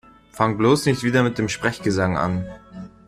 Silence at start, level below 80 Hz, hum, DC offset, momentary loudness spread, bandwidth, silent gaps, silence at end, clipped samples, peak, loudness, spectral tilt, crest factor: 0.35 s; -50 dBFS; none; under 0.1%; 14 LU; 15 kHz; none; 0.2 s; under 0.1%; -4 dBFS; -21 LUFS; -5.5 dB/octave; 18 dB